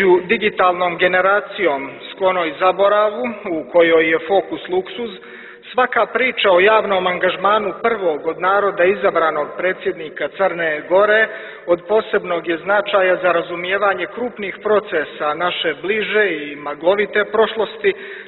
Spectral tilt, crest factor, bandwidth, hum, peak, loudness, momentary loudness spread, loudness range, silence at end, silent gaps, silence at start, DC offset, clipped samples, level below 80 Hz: -8.5 dB/octave; 16 dB; 4.2 kHz; none; -2 dBFS; -17 LUFS; 11 LU; 3 LU; 0 s; none; 0 s; under 0.1%; under 0.1%; -58 dBFS